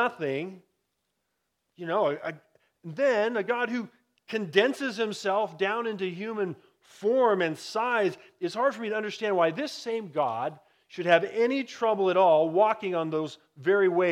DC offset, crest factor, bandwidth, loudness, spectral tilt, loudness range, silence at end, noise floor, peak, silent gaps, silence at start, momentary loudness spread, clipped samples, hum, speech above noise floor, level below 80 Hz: under 0.1%; 22 dB; 12.5 kHz; -27 LUFS; -5 dB/octave; 5 LU; 0 s; -80 dBFS; -6 dBFS; none; 0 s; 12 LU; under 0.1%; none; 53 dB; -84 dBFS